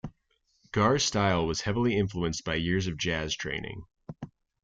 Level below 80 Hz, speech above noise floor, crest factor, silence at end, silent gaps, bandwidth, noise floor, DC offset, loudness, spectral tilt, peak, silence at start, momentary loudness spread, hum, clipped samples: -50 dBFS; 44 dB; 18 dB; 0.35 s; none; 9.4 kHz; -72 dBFS; under 0.1%; -28 LUFS; -4.5 dB/octave; -12 dBFS; 0.05 s; 19 LU; none; under 0.1%